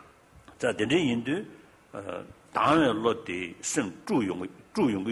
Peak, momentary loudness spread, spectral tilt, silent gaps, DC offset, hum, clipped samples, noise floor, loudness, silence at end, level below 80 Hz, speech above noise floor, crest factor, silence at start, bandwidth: -10 dBFS; 16 LU; -4.5 dB/octave; none; under 0.1%; none; under 0.1%; -54 dBFS; -28 LUFS; 0 s; -60 dBFS; 27 dB; 18 dB; 0.5 s; 12 kHz